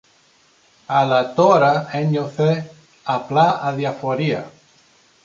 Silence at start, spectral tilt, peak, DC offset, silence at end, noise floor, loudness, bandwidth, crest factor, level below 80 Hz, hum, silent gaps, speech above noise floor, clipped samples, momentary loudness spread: 0.9 s; -7 dB/octave; -2 dBFS; under 0.1%; 0.75 s; -56 dBFS; -18 LUFS; 7.4 kHz; 18 dB; -64 dBFS; none; none; 38 dB; under 0.1%; 11 LU